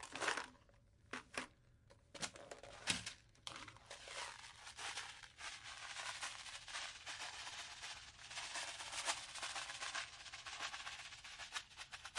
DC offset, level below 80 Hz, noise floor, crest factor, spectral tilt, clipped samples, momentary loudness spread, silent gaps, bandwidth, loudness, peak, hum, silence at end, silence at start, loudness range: under 0.1%; -74 dBFS; -69 dBFS; 30 dB; -0.5 dB/octave; under 0.1%; 11 LU; none; 12 kHz; -47 LUFS; -20 dBFS; none; 0 s; 0 s; 3 LU